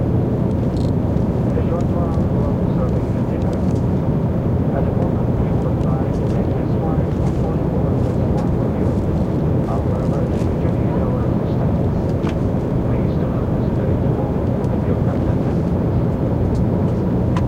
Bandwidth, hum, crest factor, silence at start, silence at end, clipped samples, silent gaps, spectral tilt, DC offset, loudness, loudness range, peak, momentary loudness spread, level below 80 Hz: 8.4 kHz; none; 12 dB; 0 s; 0 s; under 0.1%; none; -10 dB/octave; under 0.1%; -19 LUFS; 0 LU; -4 dBFS; 1 LU; -28 dBFS